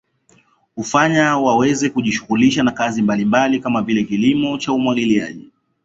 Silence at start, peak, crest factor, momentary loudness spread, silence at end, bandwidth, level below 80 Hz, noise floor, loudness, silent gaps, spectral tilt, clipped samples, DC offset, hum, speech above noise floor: 0.75 s; -2 dBFS; 16 dB; 5 LU; 0.45 s; 8 kHz; -54 dBFS; -56 dBFS; -16 LUFS; none; -5 dB/octave; under 0.1%; under 0.1%; none; 40 dB